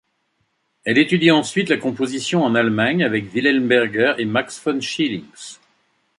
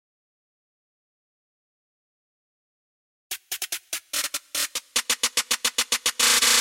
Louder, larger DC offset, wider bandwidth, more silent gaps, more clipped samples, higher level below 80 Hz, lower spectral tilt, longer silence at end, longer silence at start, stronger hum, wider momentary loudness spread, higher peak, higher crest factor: first, -18 LUFS vs -23 LUFS; neither; second, 11.5 kHz vs 16.5 kHz; neither; neither; about the same, -62 dBFS vs -62 dBFS; first, -5 dB/octave vs 2.5 dB/octave; first, 0.65 s vs 0 s; second, 0.85 s vs 3.3 s; neither; second, 9 LU vs 13 LU; first, -2 dBFS vs -6 dBFS; about the same, 18 dB vs 22 dB